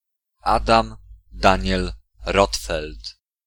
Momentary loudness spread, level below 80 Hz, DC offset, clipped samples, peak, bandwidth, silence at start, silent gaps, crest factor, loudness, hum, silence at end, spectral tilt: 16 LU; -32 dBFS; under 0.1%; under 0.1%; 0 dBFS; 18.5 kHz; 0.45 s; none; 22 dB; -21 LUFS; none; 0.35 s; -4.5 dB/octave